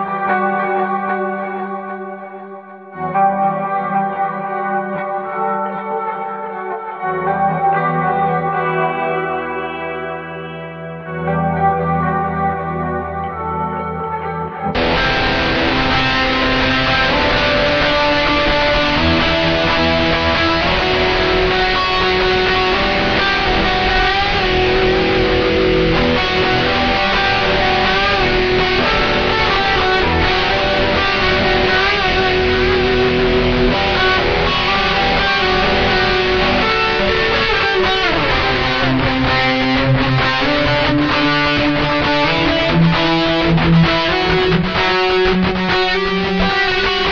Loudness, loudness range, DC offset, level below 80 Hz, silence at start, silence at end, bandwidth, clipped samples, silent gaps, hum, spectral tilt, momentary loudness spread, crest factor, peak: -15 LUFS; 6 LU; under 0.1%; -28 dBFS; 0 s; 0 s; 7 kHz; under 0.1%; none; none; -5.5 dB/octave; 9 LU; 14 dB; -2 dBFS